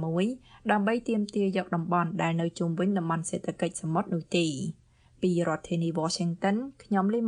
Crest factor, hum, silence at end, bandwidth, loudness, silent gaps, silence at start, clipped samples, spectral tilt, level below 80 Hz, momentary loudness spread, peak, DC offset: 20 dB; none; 0 s; 10.5 kHz; -29 LUFS; none; 0 s; under 0.1%; -6 dB/octave; -64 dBFS; 5 LU; -8 dBFS; under 0.1%